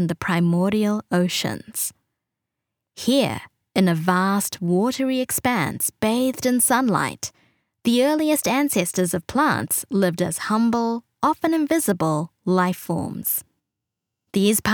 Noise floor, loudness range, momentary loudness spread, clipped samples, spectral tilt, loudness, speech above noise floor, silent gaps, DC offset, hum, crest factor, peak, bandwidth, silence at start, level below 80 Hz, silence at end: -83 dBFS; 3 LU; 7 LU; under 0.1%; -4.5 dB/octave; -21 LUFS; 62 dB; none; under 0.1%; none; 18 dB; -4 dBFS; over 20 kHz; 0 s; -58 dBFS; 0 s